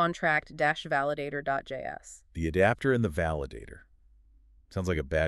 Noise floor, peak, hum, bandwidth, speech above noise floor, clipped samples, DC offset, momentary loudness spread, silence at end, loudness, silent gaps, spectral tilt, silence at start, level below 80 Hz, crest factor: -59 dBFS; -10 dBFS; none; 13 kHz; 30 dB; under 0.1%; under 0.1%; 15 LU; 0 s; -29 LUFS; none; -6 dB/octave; 0 s; -46 dBFS; 20 dB